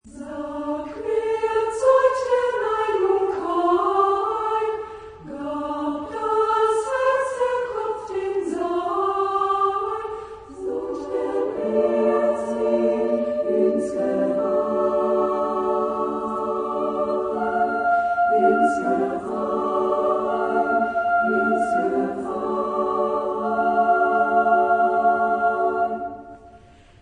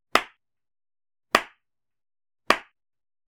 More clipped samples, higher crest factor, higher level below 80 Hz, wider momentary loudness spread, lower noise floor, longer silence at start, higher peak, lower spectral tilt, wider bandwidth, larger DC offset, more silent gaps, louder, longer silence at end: neither; second, 14 dB vs 28 dB; about the same, -56 dBFS vs -60 dBFS; second, 9 LU vs 17 LU; second, -49 dBFS vs -73 dBFS; about the same, 0.05 s vs 0.15 s; second, -6 dBFS vs -2 dBFS; first, -6 dB/octave vs -1.5 dB/octave; second, 10.5 kHz vs 19 kHz; neither; neither; first, -22 LUFS vs -25 LUFS; second, 0.45 s vs 0.7 s